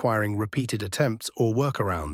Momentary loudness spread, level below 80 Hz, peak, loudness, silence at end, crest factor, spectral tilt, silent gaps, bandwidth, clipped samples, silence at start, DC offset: 4 LU; -50 dBFS; -8 dBFS; -26 LUFS; 0 s; 16 dB; -6 dB/octave; none; 16.5 kHz; under 0.1%; 0 s; under 0.1%